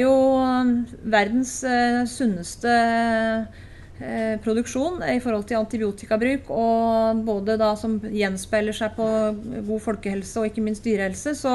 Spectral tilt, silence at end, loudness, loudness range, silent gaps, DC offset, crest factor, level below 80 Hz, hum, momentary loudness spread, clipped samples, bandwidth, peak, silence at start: -5 dB/octave; 0 s; -23 LUFS; 4 LU; none; under 0.1%; 16 dB; -48 dBFS; none; 7 LU; under 0.1%; 12 kHz; -6 dBFS; 0 s